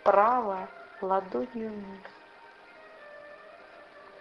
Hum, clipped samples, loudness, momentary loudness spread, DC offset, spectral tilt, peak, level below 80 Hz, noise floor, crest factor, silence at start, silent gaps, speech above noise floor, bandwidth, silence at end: none; under 0.1%; -29 LUFS; 26 LU; under 0.1%; -7.5 dB/octave; -8 dBFS; -70 dBFS; -53 dBFS; 24 dB; 0 s; none; 25 dB; 6.4 kHz; 0 s